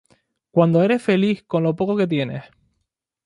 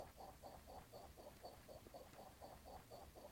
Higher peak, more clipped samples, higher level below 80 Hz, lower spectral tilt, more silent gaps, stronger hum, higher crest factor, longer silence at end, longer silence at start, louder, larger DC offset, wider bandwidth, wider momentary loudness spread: first, -2 dBFS vs -42 dBFS; neither; first, -62 dBFS vs -70 dBFS; first, -8 dB/octave vs -4.5 dB/octave; neither; neither; about the same, 18 dB vs 18 dB; first, 0.85 s vs 0 s; first, 0.55 s vs 0 s; first, -20 LUFS vs -60 LUFS; neither; second, 11 kHz vs 16.5 kHz; first, 8 LU vs 2 LU